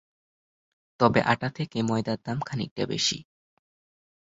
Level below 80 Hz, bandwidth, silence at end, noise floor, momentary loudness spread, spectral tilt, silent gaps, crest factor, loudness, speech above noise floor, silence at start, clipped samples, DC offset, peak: -60 dBFS; 8 kHz; 1 s; under -90 dBFS; 9 LU; -4.5 dB/octave; 2.71-2.76 s; 24 dB; -27 LUFS; over 64 dB; 1 s; under 0.1%; under 0.1%; -4 dBFS